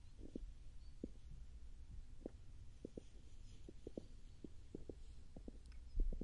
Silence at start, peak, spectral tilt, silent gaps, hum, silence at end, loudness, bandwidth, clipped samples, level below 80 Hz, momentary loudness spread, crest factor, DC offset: 0 s; -28 dBFS; -7.5 dB/octave; none; none; 0 s; -58 LUFS; 10.5 kHz; under 0.1%; -52 dBFS; 7 LU; 22 dB; under 0.1%